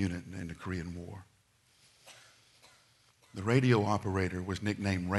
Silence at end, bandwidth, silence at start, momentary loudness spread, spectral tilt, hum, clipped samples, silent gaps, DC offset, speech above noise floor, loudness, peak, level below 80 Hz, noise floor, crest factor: 0 s; 12 kHz; 0 s; 24 LU; -6.5 dB/octave; none; under 0.1%; none; under 0.1%; 36 dB; -33 LUFS; -12 dBFS; -60 dBFS; -68 dBFS; 22 dB